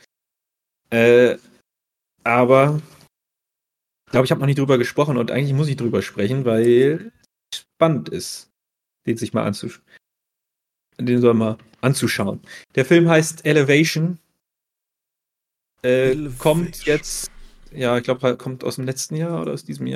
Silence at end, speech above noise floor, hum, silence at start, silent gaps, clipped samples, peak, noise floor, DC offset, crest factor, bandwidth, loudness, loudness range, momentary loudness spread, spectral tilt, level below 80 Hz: 0 s; 66 dB; none; 0.9 s; none; under 0.1%; -2 dBFS; -84 dBFS; under 0.1%; 18 dB; 15 kHz; -19 LUFS; 5 LU; 14 LU; -6 dB/octave; -50 dBFS